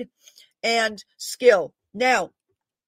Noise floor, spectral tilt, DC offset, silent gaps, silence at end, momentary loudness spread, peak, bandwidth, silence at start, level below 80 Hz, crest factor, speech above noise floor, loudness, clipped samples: -78 dBFS; -2 dB/octave; under 0.1%; none; 0.6 s; 16 LU; -2 dBFS; 16 kHz; 0 s; -70 dBFS; 20 dB; 56 dB; -21 LUFS; under 0.1%